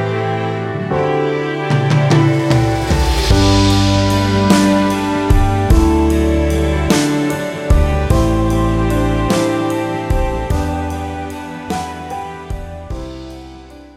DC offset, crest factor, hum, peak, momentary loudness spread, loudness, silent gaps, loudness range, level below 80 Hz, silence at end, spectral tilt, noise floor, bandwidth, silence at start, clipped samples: under 0.1%; 14 dB; none; 0 dBFS; 15 LU; -15 LUFS; none; 9 LU; -20 dBFS; 0.1 s; -6 dB/octave; -36 dBFS; 16 kHz; 0 s; under 0.1%